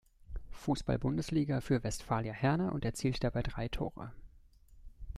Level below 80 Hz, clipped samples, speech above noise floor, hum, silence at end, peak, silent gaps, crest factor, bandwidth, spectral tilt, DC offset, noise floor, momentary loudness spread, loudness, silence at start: -48 dBFS; under 0.1%; 26 dB; none; 0 s; -16 dBFS; none; 20 dB; 13.5 kHz; -6.5 dB/octave; under 0.1%; -60 dBFS; 16 LU; -35 LUFS; 0.3 s